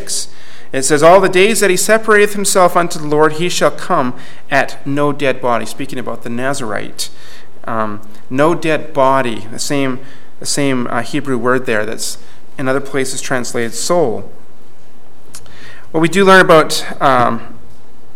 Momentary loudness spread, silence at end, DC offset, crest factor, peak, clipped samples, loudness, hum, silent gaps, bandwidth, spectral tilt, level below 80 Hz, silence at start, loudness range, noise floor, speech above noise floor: 15 LU; 0.6 s; 10%; 16 dB; 0 dBFS; 0.2%; -14 LUFS; none; none; 17 kHz; -4 dB/octave; -52 dBFS; 0 s; 8 LU; -46 dBFS; 32 dB